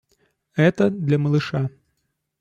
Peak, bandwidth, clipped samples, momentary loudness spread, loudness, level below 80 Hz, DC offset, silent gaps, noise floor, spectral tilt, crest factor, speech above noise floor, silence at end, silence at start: -6 dBFS; 7.6 kHz; under 0.1%; 11 LU; -21 LUFS; -60 dBFS; under 0.1%; none; -74 dBFS; -8 dB/octave; 16 dB; 55 dB; 0.7 s; 0.55 s